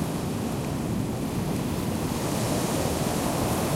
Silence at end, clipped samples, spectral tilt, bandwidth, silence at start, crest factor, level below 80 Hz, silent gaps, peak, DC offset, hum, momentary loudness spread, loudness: 0 s; under 0.1%; -5.5 dB/octave; 16 kHz; 0 s; 14 dB; -42 dBFS; none; -12 dBFS; under 0.1%; none; 3 LU; -28 LUFS